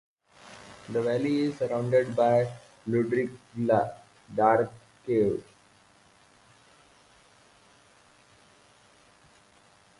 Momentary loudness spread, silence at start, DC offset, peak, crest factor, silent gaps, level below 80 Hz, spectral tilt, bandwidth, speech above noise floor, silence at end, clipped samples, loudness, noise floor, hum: 19 LU; 0.45 s; under 0.1%; -8 dBFS; 22 dB; none; -66 dBFS; -7.5 dB/octave; 11.5 kHz; 34 dB; 4.55 s; under 0.1%; -27 LUFS; -60 dBFS; none